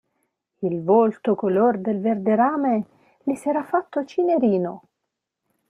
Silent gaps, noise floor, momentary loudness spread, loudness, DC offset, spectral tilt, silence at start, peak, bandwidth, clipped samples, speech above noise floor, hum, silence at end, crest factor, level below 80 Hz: none; -81 dBFS; 11 LU; -22 LUFS; under 0.1%; -8.5 dB/octave; 0.6 s; -6 dBFS; 11 kHz; under 0.1%; 60 dB; none; 0.9 s; 16 dB; -70 dBFS